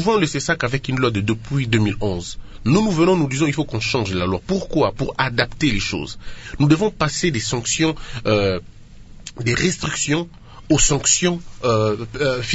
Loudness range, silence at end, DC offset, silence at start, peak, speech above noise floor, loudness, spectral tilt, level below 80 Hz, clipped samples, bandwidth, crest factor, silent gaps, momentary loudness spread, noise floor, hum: 2 LU; 0 s; under 0.1%; 0 s; 0 dBFS; 20 dB; -20 LUFS; -4.5 dB/octave; -36 dBFS; under 0.1%; 8 kHz; 20 dB; none; 9 LU; -39 dBFS; none